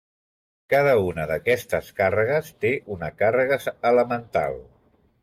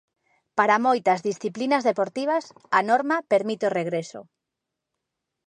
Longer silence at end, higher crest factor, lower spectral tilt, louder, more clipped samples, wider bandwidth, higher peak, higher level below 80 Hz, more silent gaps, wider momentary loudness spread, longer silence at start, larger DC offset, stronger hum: second, 0.6 s vs 1.25 s; second, 14 dB vs 20 dB; about the same, -6 dB/octave vs -5 dB/octave; about the same, -23 LUFS vs -23 LUFS; neither; first, 16 kHz vs 10.5 kHz; about the same, -8 dBFS vs -6 dBFS; first, -56 dBFS vs -78 dBFS; neither; about the same, 8 LU vs 9 LU; first, 0.7 s vs 0.55 s; neither; neither